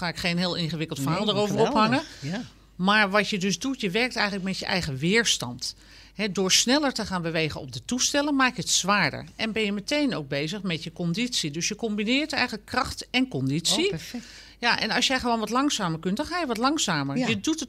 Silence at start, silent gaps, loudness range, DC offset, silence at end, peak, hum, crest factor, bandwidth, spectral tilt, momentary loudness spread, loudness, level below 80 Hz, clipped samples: 0 s; none; 3 LU; under 0.1%; 0 s; -6 dBFS; none; 20 dB; 16 kHz; -3.5 dB/octave; 10 LU; -25 LUFS; -54 dBFS; under 0.1%